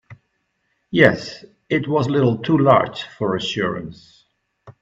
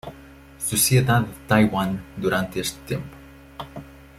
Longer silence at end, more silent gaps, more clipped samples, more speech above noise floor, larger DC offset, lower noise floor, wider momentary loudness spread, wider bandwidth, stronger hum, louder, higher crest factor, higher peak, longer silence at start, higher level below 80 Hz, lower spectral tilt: about the same, 0.1 s vs 0.2 s; neither; neither; first, 52 dB vs 24 dB; neither; first, -70 dBFS vs -45 dBFS; second, 16 LU vs 22 LU; second, 7.8 kHz vs 16 kHz; neither; first, -19 LUFS vs -22 LUFS; about the same, 20 dB vs 20 dB; about the same, 0 dBFS vs -2 dBFS; about the same, 0.1 s vs 0.05 s; second, -56 dBFS vs -46 dBFS; first, -6.5 dB/octave vs -4.5 dB/octave